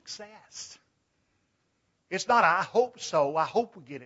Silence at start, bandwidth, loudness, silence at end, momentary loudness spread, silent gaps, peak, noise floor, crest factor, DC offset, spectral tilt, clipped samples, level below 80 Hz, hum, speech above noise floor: 0.05 s; 8 kHz; -26 LUFS; 0 s; 20 LU; none; -10 dBFS; -75 dBFS; 20 dB; under 0.1%; -3.5 dB/octave; under 0.1%; -76 dBFS; none; 47 dB